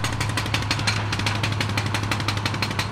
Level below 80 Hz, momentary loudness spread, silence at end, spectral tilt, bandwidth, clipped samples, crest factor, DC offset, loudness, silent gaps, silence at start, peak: -40 dBFS; 2 LU; 0 s; -4 dB/octave; 15 kHz; under 0.1%; 16 dB; under 0.1%; -24 LUFS; none; 0 s; -8 dBFS